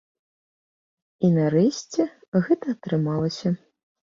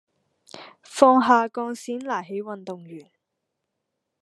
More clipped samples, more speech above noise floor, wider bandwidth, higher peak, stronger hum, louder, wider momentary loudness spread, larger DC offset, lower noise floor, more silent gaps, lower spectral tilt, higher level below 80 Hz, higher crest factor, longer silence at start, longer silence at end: neither; first, over 68 dB vs 58 dB; second, 7.4 kHz vs 12.5 kHz; second, -8 dBFS vs 0 dBFS; neither; second, -24 LUFS vs -21 LUFS; second, 7 LU vs 26 LU; neither; first, under -90 dBFS vs -80 dBFS; first, 2.28-2.32 s vs none; first, -7 dB/octave vs -4.5 dB/octave; first, -62 dBFS vs -74 dBFS; second, 16 dB vs 24 dB; first, 1.2 s vs 0.55 s; second, 0.6 s vs 1.2 s